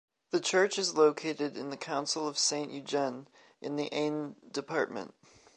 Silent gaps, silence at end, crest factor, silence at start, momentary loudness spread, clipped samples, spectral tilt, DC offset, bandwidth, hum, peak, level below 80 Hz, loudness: none; 0.5 s; 20 dB; 0.35 s; 13 LU; under 0.1%; -2.5 dB/octave; under 0.1%; 11 kHz; none; -12 dBFS; -82 dBFS; -31 LUFS